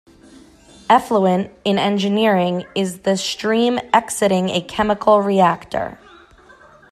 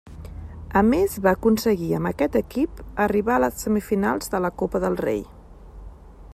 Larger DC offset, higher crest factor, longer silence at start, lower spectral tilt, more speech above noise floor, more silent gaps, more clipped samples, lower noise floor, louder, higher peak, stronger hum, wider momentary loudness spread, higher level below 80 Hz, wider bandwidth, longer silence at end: neither; about the same, 18 dB vs 16 dB; first, 0.9 s vs 0.05 s; about the same, -5 dB/octave vs -6 dB/octave; first, 30 dB vs 20 dB; neither; neither; first, -47 dBFS vs -42 dBFS; first, -18 LUFS vs -23 LUFS; first, 0 dBFS vs -6 dBFS; neither; about the same, 8 LU vs 10 LU; second, -52 dBFS vs -42 dBFS; second, 14 kHz vs 15.5 kHz; first, 1 s vs 0 s